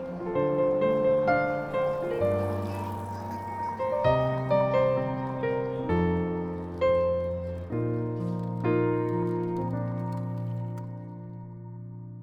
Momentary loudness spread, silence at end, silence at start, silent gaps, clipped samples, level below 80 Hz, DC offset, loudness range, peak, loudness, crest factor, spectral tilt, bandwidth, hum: 12 LU; 0 s; 0 s; none; under 0.1%; -52 dBFS; under 0.1%; 3 LU; -12 dBFS; -28 LUFS; 16 dB; -9 dB/octave; 12 kHz; none